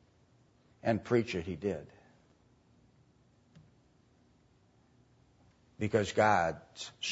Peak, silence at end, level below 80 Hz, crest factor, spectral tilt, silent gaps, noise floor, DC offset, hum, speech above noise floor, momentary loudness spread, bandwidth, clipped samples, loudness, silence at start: -14 dBFS; 0 s; -66 dBFS; 22 dB; -4.5 dB/octave; none; -67 dBFS; under 0.1%; none; 35 dB; 14 LU; 7.6 kHz; under 0.1%; -33 LUFS; 0.85 s